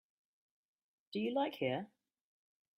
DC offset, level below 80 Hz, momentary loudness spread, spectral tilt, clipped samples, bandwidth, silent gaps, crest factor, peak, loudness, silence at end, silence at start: under 0.1%; -86 dBFS; 9 LU; -7 dB/octave; under 0.1%; 15 kHz; none; 18 dB; -24 dBFS; -39 LUFS; 0.9 s; 1.1 s